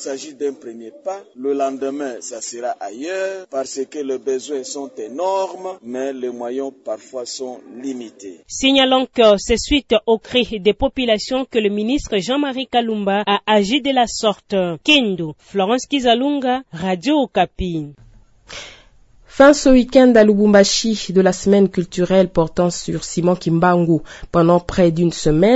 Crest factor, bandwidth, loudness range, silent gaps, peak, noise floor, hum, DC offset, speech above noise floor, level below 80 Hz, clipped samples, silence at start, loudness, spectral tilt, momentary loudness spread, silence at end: 18 dB; 8 kHz; 11 LU; none; 0 dBFS; -48 dBFS; none; under 0.1%; 31 dB; -40 dBFS; under 0.1%; 0 s; -17 LUFS; -5 dB/octave; 16 LU; 0 s